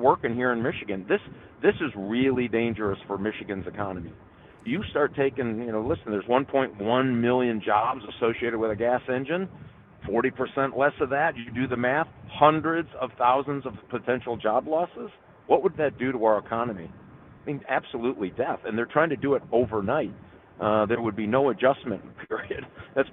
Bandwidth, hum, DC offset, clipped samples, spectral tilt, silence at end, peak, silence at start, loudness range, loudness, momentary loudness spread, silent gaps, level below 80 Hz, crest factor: 4.1 kHz; none; under 0.1%; under 0.1%; -10 dB/octave; 0 s; -4 dBFS; 0 s; 3 LU; -26 LUFS; 11 LU; none; -56 dBFS; 22 dB